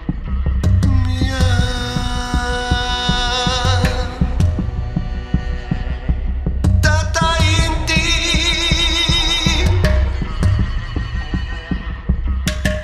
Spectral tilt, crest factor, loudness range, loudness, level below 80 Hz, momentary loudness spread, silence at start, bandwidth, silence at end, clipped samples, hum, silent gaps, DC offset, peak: -4.5 dB/octave; 16 dB; 5 LU; -17 LUFS; -20 dBFS; 10 LU; 0 s; 14 kHz; 0 s; under 0.1%; none; none; under 0.1%; -2 dBFS